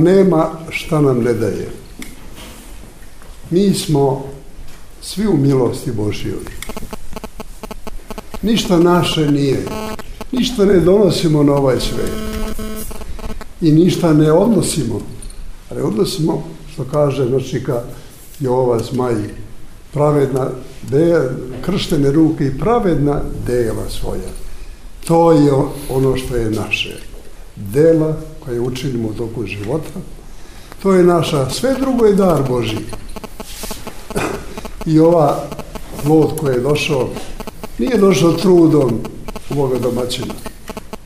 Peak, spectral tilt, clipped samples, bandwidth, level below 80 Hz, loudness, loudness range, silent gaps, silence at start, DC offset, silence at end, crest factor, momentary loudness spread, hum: 0 dBFS; -6.5 dB/octave; under 0.1%; 16 kHz; -32 dBFS; -15 LUFS; 5 LU; none; 0 s; under 0.1%; 0 s; 16 dB; 20 LU; none